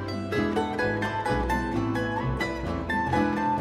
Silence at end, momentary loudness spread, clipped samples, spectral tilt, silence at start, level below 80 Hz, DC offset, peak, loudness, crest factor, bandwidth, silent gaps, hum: 0 s; 4 LU; under 0.1%; -6.5 dB/octave; 0 s; -40 dBFS; under 0.1%; -12 dBFS; -27 LUFS; 16 dB; 15 kHz; none; none